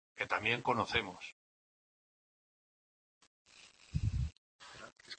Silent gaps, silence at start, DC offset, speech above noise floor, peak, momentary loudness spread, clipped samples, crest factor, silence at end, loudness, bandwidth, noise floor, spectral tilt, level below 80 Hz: 1.32-3.21 s, 3.27-3.45 s, 4.38-4.59 s; 0.15 s; under 0.1%; over 54 dB; -16 dBFS; 21 LU; under 0.1%; 24 dB; 0.05 s; -36 LUFS; 8.4 kHz; under -90 dBFS; -5 dB/octave; -52 dBFS